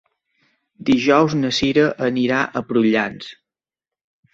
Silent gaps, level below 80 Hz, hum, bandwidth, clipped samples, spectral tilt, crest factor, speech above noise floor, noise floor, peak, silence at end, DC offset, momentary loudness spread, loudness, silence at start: none; -54 dBFS; none; 8 kHz; under 0.1%; -5.5 dB/octave; 18 dB; 72 dB; -89 dBFS; -2 dBFS; 1 s; under 0.1%; 11 LU; -18 LUFS; 0.8 s